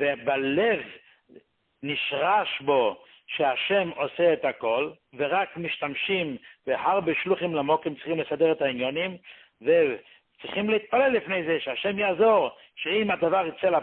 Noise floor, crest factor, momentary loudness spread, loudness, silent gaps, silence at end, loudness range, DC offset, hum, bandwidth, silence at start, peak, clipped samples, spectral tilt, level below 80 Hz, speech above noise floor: -56 dBFS; 16 dB; 10 LU; -25 LUFS; none; 0 s; 2 LU; under 0.1%; none; 4.3 kHz; 0 s; -10 dBFS; under 0.1%; -9 dB/octave; -68 dBFS; 30 dB